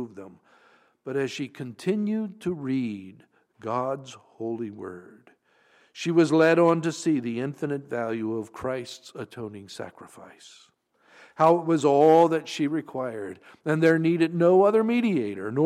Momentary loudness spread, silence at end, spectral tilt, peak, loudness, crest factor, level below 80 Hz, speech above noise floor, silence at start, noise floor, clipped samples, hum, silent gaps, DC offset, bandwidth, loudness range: 20 LU; 0 s; -6.5 dB/octave; -8 dBFS; -24 LUFS; 18 dB; -70 dBFS; 37 dB; 0 s; -62 dBFS; under 0.1%; none; none; under 0.1%; 12 kHz; 11 LU